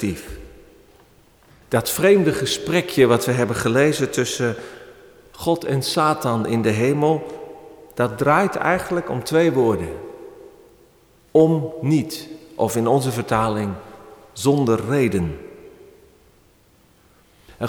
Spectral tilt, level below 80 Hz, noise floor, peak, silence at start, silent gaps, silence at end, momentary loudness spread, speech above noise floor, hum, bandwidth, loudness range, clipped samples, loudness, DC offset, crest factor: -5.5 dB/octave; -50 dBFS; -55 dBFS; -4 dBFS; 0 s; none; 0 s; 19 LU; 36 dB; none; over 20 kHz; 4 LU; under 0.1%; -20 LUFS; under 0.1%; 18 dB